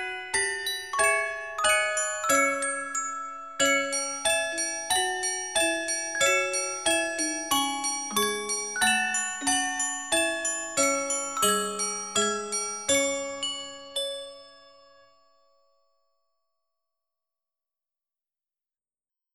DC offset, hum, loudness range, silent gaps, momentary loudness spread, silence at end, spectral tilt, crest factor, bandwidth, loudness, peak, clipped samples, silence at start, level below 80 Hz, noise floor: 0.1%; none; 6 LU; none; 8 LU; 4.75 s; 0 dB/octave; 20 dB; 17.5 kHz; -26 LUFS; -8 dBFS; under 0.1%; 0 s; -64 dBFS; under -90 dBFS